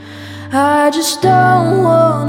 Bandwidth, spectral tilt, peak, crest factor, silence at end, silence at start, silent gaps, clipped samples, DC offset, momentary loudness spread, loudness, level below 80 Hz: 17.5 kHz; -5 dB/octave; -2 dBFS; 10 dB; 0 s; 0 s; none; under 0.1%; under 0.1%; 11 LU; -12 LUFS; -52 dBFS